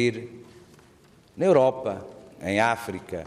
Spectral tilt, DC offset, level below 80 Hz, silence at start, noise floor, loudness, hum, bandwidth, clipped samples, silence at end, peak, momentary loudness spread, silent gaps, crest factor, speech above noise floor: -6 dB/octave; under 0.1%; -62 dBFS; 0 s; -56 dBFS; -24 LUFS; none; 15 kHz; under 0.1%; 0 s; -8 dBFS; 19 LU; none; 18 dB; 31 dB